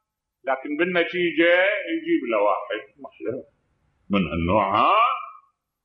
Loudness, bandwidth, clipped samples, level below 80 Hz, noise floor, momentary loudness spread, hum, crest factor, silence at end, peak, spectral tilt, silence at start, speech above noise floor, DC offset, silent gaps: -22 LUFS; 5.4 kHz; under 0.1%; -50 dBFS; -68 dBFS; 15 LU; none; 16 dB; 0.5 s; -6 dBFS; -8.5 dB/octave; 0.45 s; 46 dB; under 0.1%; none